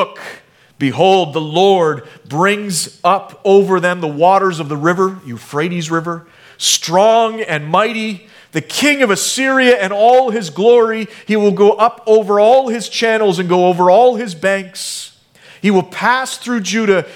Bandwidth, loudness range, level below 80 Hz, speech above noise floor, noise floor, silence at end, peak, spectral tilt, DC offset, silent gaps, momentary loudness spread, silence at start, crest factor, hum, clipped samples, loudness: 17 kHz; 3 LU; -64 dBFS; 31 dB; -44 dBFS; 0 s; 0 dBFS; -4 dB/octave; under 0.1%; none; 12 LU; 0 s; 14 dB; none; under 0.1%; -13 LUFS